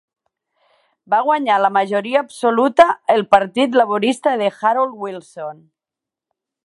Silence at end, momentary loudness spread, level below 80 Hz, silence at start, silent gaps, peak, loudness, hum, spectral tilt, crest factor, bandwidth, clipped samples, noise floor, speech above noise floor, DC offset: 1.1 s; 16 LU; -62 dBFS; 1.1 s; none; 0 dBFS; -16 LUFS; none; -4.5 dB/octave; 18 dB; 11.5 kHz; under 0.1%; -87 dBFS; 70 dB; under 0.1%